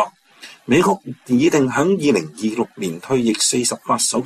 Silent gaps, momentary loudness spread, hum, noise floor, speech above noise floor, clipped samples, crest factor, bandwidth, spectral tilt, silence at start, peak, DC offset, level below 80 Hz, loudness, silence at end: none; 9 LU; none; -43 dBFS; 25 dB; under 0.1%; 14 dB; 14.5 kHz; -4 dB/octave; 0 s; -4 dBFS; under 0.1%; -58 dBFS; -18 LUFS; 0 s